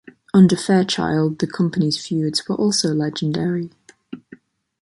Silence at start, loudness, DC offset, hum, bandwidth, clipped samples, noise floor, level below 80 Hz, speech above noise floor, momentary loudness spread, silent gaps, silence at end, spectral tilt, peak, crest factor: 0.35 s; -19 LUFS; under 0.1%; none; 11.5 kHz; under 0.1%; -47 dBFS; -56 dBFS; 29 dB; 20 LU; none; 0.65 s; -5.5 dB/octave; -2 dBFS; 16 dB